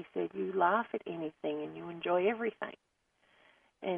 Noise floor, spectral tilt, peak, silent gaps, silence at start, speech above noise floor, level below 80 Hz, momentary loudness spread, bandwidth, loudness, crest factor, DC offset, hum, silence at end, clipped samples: -70 dBFS; -8 dB/octave; -14 dBFS; none; 0 s; 36 dB; -80 dBFS; 13 LU; 3.8 kHz; -35 LUFS; 20 dB; under 0.1%; none; 0 s; under 0.1%